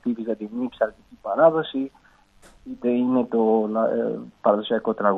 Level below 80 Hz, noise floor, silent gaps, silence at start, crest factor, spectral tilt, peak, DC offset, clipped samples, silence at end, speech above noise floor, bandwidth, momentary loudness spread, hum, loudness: -62 dBFS; -53 dBFS; none; 0.05 s; 18 dB; -8 dB/octave; -4 dBFS; under 0.1%; under 0.1%; 0 s; 31 dB; 4.1 kHz; 11 LU; none; -23 LUFS